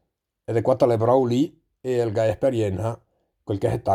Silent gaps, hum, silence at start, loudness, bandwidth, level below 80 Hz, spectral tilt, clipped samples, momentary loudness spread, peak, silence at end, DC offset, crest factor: none; none; 0.5 s; -23 LUFS; 14 kHz; -54 dBFS; -8 dB/octave; under 0.1%; 15 LU; -4 dBFS; 0 s; under 0.1%; 18 dB